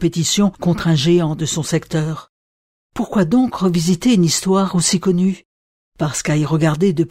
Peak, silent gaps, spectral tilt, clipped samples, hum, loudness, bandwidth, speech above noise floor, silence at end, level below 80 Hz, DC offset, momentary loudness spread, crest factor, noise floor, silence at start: -4 dBFS; 2.29-2.90 s, 5.45-5.92 s; -5 dB/octave; under 0.1%; none; -17 LUFS; 15.5 kHz; over 74 dB; 0.05 s; -46 dBFS; under 0.1%; 8 LU; 14 dB; under -90 dBFS; 0 s